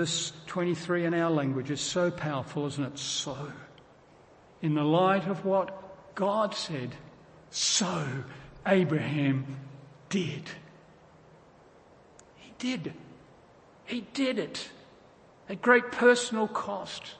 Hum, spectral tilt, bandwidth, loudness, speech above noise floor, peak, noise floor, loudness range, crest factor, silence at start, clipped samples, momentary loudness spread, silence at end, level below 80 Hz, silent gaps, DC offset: none; -4.5 dB/octave; 8.8 kHz; -29 LUFS; 28 dB; -8 dBFS; -57 dBFS; 11 LU; 22 dB; 0 s; under 0.1%; 18 LU; 0 s; -68 dBFS; none; under 0.1%